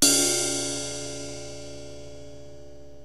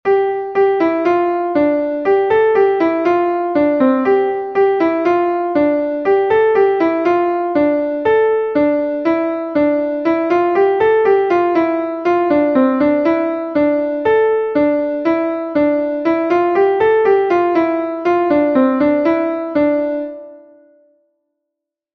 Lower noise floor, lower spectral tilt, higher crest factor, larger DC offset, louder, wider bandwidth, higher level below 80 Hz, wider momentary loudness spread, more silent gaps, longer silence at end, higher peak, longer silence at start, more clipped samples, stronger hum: second, -47 dBFS vs -80 dBFS; second, -1.5 dB/octave vs -7.5 dB/octave; first, 26 dB vs 12 dB; first, 0.9% vs under 0.1%; second, -25 LUFS vs -15 LUFS; first, 16 kHz vs 6.2 kHz; about the same, -54 dBFS vs -54 dBFS; first, 25 LU vs 4 LU; neither; second, 0 s vs 1.55 s; about the same, -2 dBFS vs -2 dBFS; about the same, 0 s vs 0.05 s; neither; neither